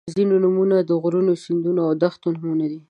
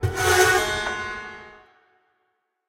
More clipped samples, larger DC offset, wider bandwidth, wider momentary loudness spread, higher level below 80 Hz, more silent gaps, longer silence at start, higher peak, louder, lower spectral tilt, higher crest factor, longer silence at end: neither; neither; second, 9.6 kHz vs 16 kHz; second, 6 LU vs 20 LU; second, -70 dBFS vs -46 dBFS; neither; about the same, 0.05 s vs 0 s; about the same, -4 dBFS vs -4 dBFS; about the same, -20 LUFS vs -21 LUFS; first, -8.5 dB/octave vs -3 dB/octave; about the same, 16 dB vs 20 dB; second, 0.1 s vs 1.15 s